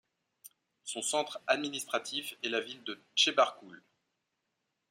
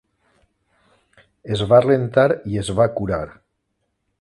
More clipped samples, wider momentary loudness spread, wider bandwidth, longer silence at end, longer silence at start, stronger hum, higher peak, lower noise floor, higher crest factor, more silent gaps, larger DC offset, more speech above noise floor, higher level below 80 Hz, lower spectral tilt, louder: neither; about the same, 15 LU vs 13 LU; first, 16 kHz vs 11.5 kHz; first, 1.15 s vs 0.9 s; second, 0.45 s vs 1.45 s; neither; second, -12 dBFS vs 0 dBFS; first, -84 dBFS vs -73 dBFS; about the same, 24 dB vs 20 dB; neither; neither; second, 50 dB vs 55 dB; second, -88 dBFS vs -46 dBFS; second, -0.5 dB/octave vs -6.5 dB/octave; second, -32 LUFS vs -18 LUFS